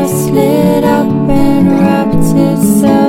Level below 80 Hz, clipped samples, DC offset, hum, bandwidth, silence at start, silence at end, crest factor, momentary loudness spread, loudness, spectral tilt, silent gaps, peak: -28 dBFS; under 0.1%; under 0.1%; none; 17 kHz; 0 s; 0 s; 8 dB; 2 LU; -10 LUFS; -7 dB/octave; none; 0 dBFS